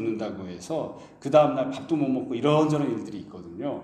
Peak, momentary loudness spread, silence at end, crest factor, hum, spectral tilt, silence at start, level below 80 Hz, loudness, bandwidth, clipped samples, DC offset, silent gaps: -6 dBFS; 17 LU; 0 s; 20 dB; none; -7 dB/octave; 0 s; -66 dBFS; -25 LUFS; 9.8 kHz; under 0.1%; under 0.1%; none